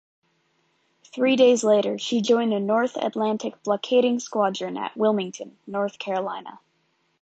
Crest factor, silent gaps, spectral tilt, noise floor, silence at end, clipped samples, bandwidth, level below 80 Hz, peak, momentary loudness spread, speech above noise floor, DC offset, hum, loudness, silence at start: 18 dB; none; -4.5 dB/octave; -69 dBFS; 0.65 s; under 0.1%; 9 kHz; -76 dBFS; -6 dBFS; 14 LU; 46 dB; under 0.1%; none; -23 LUFS; 1.15 s